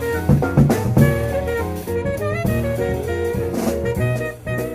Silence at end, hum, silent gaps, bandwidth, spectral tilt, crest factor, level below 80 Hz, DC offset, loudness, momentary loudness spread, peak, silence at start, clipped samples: 0 s; none; none; 16 kHz; -7.5 dB/octave; 18 dB; -32 dBFS; under 0.1%; -20 LUFS; 8 LU; -2 dBFS; 0 s; under 0.1%